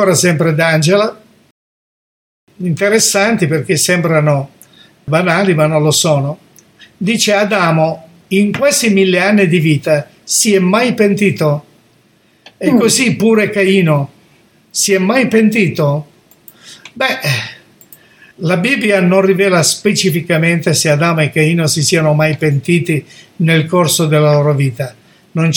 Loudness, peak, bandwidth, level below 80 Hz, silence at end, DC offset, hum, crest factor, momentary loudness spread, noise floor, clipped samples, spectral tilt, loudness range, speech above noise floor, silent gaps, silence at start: -12 LUFS; 0 dBFS; 18 kHz; -56 dBFS; 0 s; under 0.1%; none; 12 dB; 8 LU; -52 dBFS; under 0.1%; -4.5 dB/octave; 3 LU; 40 dB; 1.51-2.47 s; 0 s